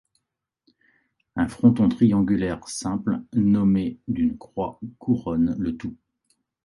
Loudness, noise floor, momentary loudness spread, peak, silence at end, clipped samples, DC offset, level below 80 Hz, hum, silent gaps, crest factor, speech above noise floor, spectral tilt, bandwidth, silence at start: -23 LUFS; -82 dBFS; 12 LU; -4 dBFS; 0.7 s; under 0.1%; under 0.1%; -48 dBFS; none; none; 20 dB; 59 dB; -7.5 dB/octave; 11.5 kHz; 1.35 s